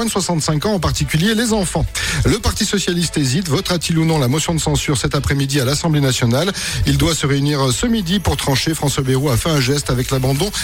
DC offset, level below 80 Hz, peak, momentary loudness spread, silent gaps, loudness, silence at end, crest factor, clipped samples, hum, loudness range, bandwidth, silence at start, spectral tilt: 0.3%; -30 dBFS; -6 dBFS; 2 LU; none; -17 LUFS; 0 s; 10 dB; under 0.1%; none; 1 LU; 16.5 kHz; 0 s; -4.5 dB/octave